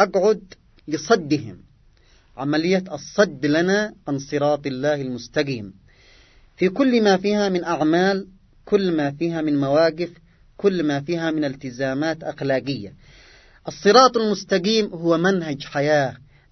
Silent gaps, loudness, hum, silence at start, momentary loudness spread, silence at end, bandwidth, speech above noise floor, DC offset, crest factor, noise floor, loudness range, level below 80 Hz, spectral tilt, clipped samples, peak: none; -21 LUFS; none; 0 s; 10 LU; 0.35 s; 6.4 kHz; 34 dB; under 0.1%; 22 dB; -54 dBFS; 5 LU; -56 dBFS; -5.5 dB/octave; under 0.1%; 0 dBFS